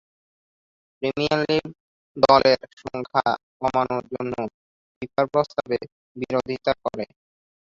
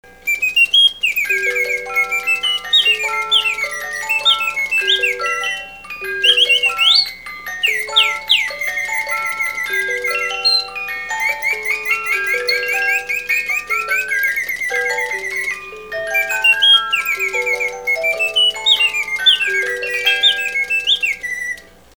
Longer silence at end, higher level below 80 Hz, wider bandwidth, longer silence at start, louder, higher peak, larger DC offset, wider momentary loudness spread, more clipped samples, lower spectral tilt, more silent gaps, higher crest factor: first, 0.7 s vs 0.4 s; about the same, -56 dBFS vs -54 dBFS; second, 7.6 kHz vs over 20 kHz; first, 1 s vs 0.05 s; second, -23 LUFS vs -15 LUFS; about the same, -2 dBFS vs 0 dBFS; second, under 0.1% vs 0.3%; first, 17 LU vs 10 LU; neither; first, -6 dB/octave vs 1.5 dB/octave; first, 1.80-2.15 s, 2.73-2.77 s, 3.43-3.60 s, 4.54-5.01 s, 5.92-6.15 s vs none; first, 24 dB vs 18 dB